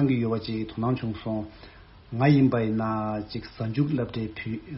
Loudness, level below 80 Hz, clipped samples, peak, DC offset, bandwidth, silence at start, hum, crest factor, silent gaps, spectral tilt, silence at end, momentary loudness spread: -27 LUFS; -52 dBFS; under 0.1%; -8 dBFS; under 0.1%; 5.8 kHz; 0 s; none; 18 dB; none; -7 dB/octave; 0 s; 13 LU